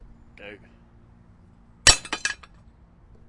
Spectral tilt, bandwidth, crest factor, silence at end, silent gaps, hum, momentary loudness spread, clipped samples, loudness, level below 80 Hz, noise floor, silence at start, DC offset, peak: 0 dB/octave; 11.5 kHz; 28 dB; 0.95 s; none; none; 26 LU; under 0.1%; -20 LUFS; -42 dBFS; -53 dBFS; 0.45 s; under 0.1%; 0 dBFS